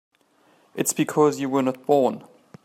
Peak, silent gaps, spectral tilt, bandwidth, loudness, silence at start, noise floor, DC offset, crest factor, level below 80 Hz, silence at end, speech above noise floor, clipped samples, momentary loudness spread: -6 dBFS; none; -5 dB/octave; 16 kHz; -22 LUFS; 0.75 s; -61 dBFS; under 0.1%; 18 dB; -72 dBFS; 0.45 s; 39 dB; under 0.1%; 10 LU